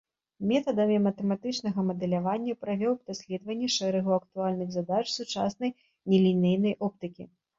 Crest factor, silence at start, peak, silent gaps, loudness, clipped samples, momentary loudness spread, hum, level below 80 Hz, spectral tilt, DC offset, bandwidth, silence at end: 18 dB; 0.4 s; -12 dBFS; none; -28 LUFS; under 0.1%; 10 LU; none; -68 dBFS; -6 dB/octave; under 0.1%; 7.8 kHz; 0.3 s